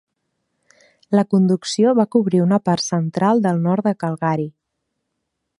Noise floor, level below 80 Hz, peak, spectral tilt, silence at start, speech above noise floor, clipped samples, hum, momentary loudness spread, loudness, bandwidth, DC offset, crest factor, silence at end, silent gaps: -76 dBFS; -66 dBFS; -2 dBFS; -6.5 dB/octave; 1.1 s; 59 dB; under 0.1%; none; 6 LU; -18 LUFS; 11 kHz; under 0.1%; 16 dB; 1.1 s; none